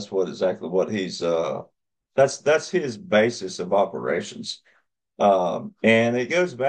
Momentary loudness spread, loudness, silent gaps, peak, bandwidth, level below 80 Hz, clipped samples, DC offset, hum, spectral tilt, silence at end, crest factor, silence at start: 10 LU; -23 LUFS; none; -4 dBFS; 9.8 kHz; -68 dBFS; under 0.1%; under 0.1%; none; -5 dB/octave; 0 s; 18 dB; 0 s